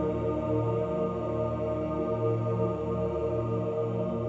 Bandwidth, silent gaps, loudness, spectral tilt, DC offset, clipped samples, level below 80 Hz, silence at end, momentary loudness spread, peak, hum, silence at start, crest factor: 7.4 kHz; none; -30 LUFS; -10 dB/octave; under 0.1%; under 0.1%; -48 dBFS; 0 s; 2 LU; -16 dBFS; none; 0 s; 12 dB